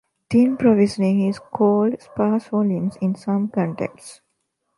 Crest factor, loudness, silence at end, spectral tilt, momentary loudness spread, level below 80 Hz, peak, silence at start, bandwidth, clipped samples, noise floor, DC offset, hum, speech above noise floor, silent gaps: 16 dB; -20 LUFS; 0.65 s; -8 dB/octave; 8 LU; -60 dBFS; -4 dBFS; 0.3 s; 11.5 kHz; under 0.1%; -73 dBFS; under 0.1%; none; 54 dB; none